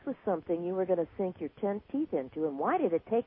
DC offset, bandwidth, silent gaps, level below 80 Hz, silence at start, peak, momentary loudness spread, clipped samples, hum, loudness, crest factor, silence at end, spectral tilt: under 0.1%; 3.8 kHz; none; -66 dBFS; 0.05 s; -16 dBFS; 6 LU; under 0.1%; none; -33 LUFS; 16 dB; 0.05 s; -11 dB/octave